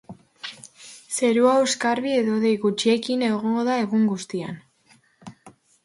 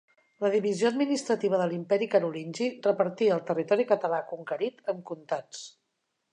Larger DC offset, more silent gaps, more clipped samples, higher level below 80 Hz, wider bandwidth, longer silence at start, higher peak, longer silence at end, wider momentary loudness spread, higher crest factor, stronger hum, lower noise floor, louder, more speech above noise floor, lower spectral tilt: neither; neither; neither; first, -70 dBFS vs -84 dBFS; about the same, 11.5 kHz vs 10.5 kHz; second, 0.1 s vs 0.4 s; first, -6 dBFS vs -10 dBFS; second, 0.35 s vs 0.65 s; first, 19 LU vs 10 LU; about the same, 16 dB vs 18 dB; neither; second, -59 dBFS vs -80 dBFS; first, -22 LUFS vs -28 LUFS; second, 38 dB vs 52 dB; about the same, -4.5 dB/octave vs -5.5 dB/octave